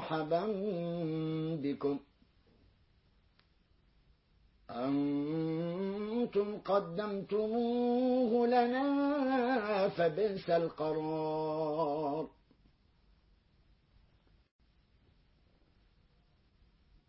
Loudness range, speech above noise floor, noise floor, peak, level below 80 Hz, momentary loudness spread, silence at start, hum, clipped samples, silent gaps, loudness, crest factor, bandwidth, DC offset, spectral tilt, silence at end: 11 LU; 37 dB; -69 dBFS; -18 dBFS; -70 dBFS; 7 LU; 0 s; none; under 0.1%; none; -34 LUFS; 18 dB; 5.6 kHz; under 0.1%; -5.5 dB/octave; 4.8 s